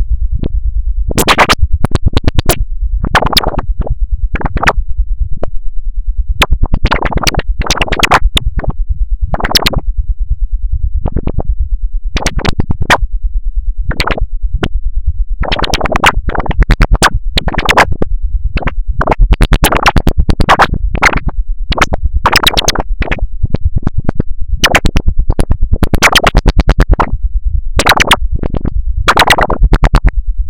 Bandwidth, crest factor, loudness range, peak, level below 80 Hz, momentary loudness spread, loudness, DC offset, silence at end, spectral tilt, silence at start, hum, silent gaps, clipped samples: 17.5 kHz; 10 dB; 5 LU; 0 dBFS; -12 dBFS; 11 LU; -13 LUFS; 10%; 0 s; -4 dB/octave; 0 s; none; none; 1%